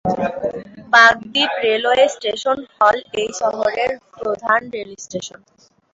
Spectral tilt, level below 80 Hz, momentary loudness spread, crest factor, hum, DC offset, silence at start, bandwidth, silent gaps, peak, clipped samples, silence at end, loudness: -2.5 dB/octave; -56 dBFS; 18 LU; 18 dB; none; under 0.1%; 0.05 s; 8 kHz; none; 0 dBFS; under 0.1%; 0.65 s; -17 LUFS